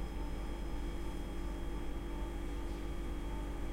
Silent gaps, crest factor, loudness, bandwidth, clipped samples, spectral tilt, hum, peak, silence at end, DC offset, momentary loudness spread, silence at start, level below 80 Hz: none; 10 dB; -43 LUFS; 16 kHz; under 0.1%; -6.5 dB/octave; none; -28 dBFS; 0 s; under 0.1%; 1 LU; 0 s; -40 dBFS